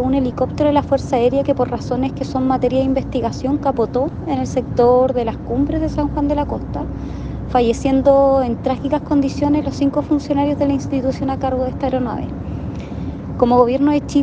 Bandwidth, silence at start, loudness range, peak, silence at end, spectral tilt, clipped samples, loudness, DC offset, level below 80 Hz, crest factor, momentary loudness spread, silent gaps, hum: 8.4 kHz; 0 s; 3 LU; 0 dBFS; 0 s; -7.5 dB/octave; under 0.1%; -18 LUFS; under 0.1%; -34 dBFS; 18 dB; 12 LU; none; none